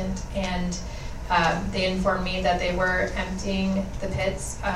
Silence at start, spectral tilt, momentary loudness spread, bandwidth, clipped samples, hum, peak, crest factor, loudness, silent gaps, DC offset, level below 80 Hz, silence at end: 0 s; -5 dB/octave; 7 LU; 13.5 kHz; under 0.1%; none; -8 dBFS; 16 dB; -26 LUFS; none; under 0.1%; -34 dBFS; 0 s